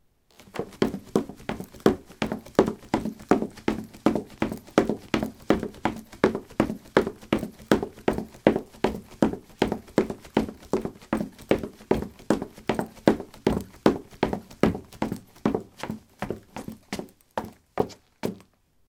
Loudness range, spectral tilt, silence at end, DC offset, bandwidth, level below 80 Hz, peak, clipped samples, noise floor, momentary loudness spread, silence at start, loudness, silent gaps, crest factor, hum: 4 LU; -6.5 dB/octave; 0.5 s; under 0.1%; 18 kHz; -48 dBFS; 0 dBFS; under 0.1%; -58 dBFS; 11 LU; 0.55 s; -28 LUFS; none; 26 dB; none